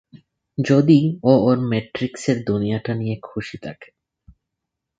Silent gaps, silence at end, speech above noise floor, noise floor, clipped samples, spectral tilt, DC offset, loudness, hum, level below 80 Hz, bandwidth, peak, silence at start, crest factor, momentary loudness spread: none; 1.15 s; 62 dB; -81 dBFS; under 0.1%; -7.5 dB/octave; under 0.1%; -19 LUFS; none; -54 dBFS; 9.2 kHz; 0 dBFS; 0.6 s; 20 dB; 17 LU